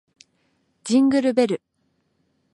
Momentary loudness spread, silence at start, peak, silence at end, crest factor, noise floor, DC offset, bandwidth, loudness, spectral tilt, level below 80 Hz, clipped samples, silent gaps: 13 LU; 0.85 s; -6 dBFS; 0.95 s; 18 dB; -69 dBFS; under 0.1%; 11 kHz; -20 LUFS; -5 dB/octave; -70 dBFS; under 0.1%; none